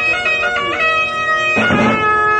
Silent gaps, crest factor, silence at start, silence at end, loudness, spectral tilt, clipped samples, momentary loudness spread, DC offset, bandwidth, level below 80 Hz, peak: none; 12 dB; 0 s; 0 s; -13 LUFS; -4.5 dB/octave; under 0.1%; 2 LU; under 0.1%; 10 kHz; -44 dBFS; -2 dBFS